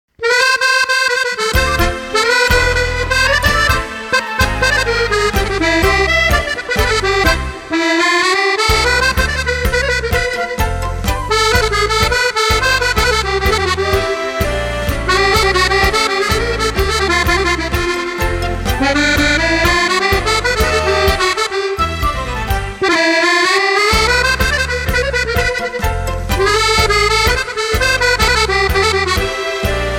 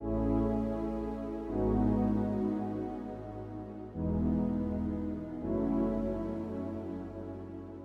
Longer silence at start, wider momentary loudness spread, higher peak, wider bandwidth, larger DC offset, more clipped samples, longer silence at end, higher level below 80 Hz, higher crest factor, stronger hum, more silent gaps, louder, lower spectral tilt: first, 0.2 s vs 0 s; second, 7 LU vs 12 LU; first, 0 dBFS vs -18 dBFS; first, 17 kHz vs 5.6 kHz; neither; neither; about the same, 0 s vs 0 s; first, -24 dBFS vs -44 dBFS; about the same, 14 dB vs 16 dB; neither; neither; first, -13 LUFS vs -34 LUFS; second, -3.5 dB/octave vs -10.5 dB/octave